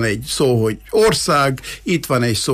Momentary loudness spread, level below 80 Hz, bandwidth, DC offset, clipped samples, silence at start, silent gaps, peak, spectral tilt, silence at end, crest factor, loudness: 6 LU; -42 dBFS; 15.5 kHz; under 0.1%; under 0.1%; 0 s; none; -4 dBFS; -4.5 dB/octave; 0 s; 12 dB; -17 LUFS